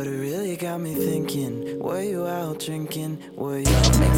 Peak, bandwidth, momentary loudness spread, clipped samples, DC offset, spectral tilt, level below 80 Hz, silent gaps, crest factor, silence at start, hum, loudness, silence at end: -6 dBFS; 17 kHz; 11 LU; under 0.1%; under 0.1%; -5.5 dB/octave; -30 dBFS; none; 18 dB; 0 s; none; -25 LUFS; 0 s